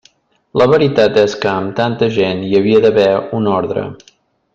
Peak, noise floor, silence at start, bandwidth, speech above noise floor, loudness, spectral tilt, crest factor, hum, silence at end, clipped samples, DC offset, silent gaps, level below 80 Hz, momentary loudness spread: 0 dBFS; -53 dBFS; 0.55 s; 7.4 kHz; 40 dB; -13 LUFS; -6.5 dB/octave; 14 dB; none; 0.6 s; under 0.1%; under 0.1%; none; -50 dBFS; 8 LU